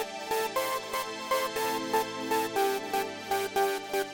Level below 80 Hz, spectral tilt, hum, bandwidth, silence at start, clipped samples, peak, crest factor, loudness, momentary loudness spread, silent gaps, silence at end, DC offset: -68 dBFS; -2 dB/octave; none; 17 kHz; 0 s; under 0.1%; -14 dBFS; 16 dB; -30 LUFS; 4 LU; none; 0 s; under 0.1%